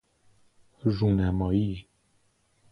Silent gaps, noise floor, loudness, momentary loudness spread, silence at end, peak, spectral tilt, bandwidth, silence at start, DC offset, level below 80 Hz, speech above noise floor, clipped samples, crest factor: none; -68 dBFS; -27 LUFS; 8 LU; 0.9 s; -12 dBFS; -9.5 dB/octave; 5.8 kHz; 0.85 s; under 0.1%; -44 dBFS; 43 dB; under 0.1%; 16 dB